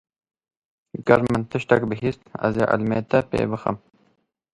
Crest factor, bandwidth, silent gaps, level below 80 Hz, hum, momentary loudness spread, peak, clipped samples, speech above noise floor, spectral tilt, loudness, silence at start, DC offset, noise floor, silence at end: 24 dB; 11.5 kHz; none; -52 dBFS; none; 10 LU; 0 dBFS; under 0.1%; 45 dB; -8 dB/octave; -22 LUFS; 0.95 s; under 0.1%; -66 dBFS; 0.75 s